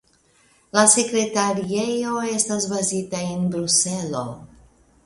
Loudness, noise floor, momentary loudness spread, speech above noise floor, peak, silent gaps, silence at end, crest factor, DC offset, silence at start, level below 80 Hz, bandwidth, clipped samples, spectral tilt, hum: -20 LUFS; -59 dBFS; 12 LU; 38 dB; 0 dBFS; none; 0.6 s; 22 dB; under 0.1%; 0.75 s; -58 dBFS; 11.5 kHz; under 0.1%; -3 dB/octave; none